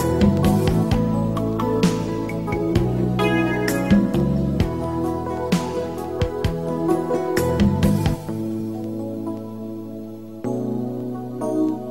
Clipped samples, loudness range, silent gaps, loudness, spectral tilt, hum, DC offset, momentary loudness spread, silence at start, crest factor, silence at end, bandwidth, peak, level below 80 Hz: under 0.1%; 7 LU; none; -22 LUFS; -7 dB/octave; none; 0.4%; 11 LU; 0 s; 16 dB; 0 s; 16 kHz; -4 dBFS; -36 dBFS